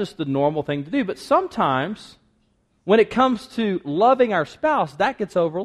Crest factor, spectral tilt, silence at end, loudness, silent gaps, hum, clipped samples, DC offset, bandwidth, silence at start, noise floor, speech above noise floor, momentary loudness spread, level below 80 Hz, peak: 16 dB; -6.5 dB/octave; 0 s; -21 LUFS; none; none; under 0.1%; under 0.1%; 12.5 kHz; 0 s; -65 dBFS; 44 dB; 8 LU; -58 dBFS; -4 dBFS